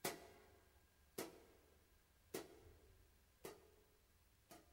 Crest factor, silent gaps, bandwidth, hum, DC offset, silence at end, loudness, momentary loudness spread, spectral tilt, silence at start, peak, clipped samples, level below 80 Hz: 28 dB; none; 16 kHz; none; under 0.1%; 0 s; -57 LUFS; 13 LU; -3 dB/octave; 0 s; -30 dBFS; under 0.1%; -76 dBFS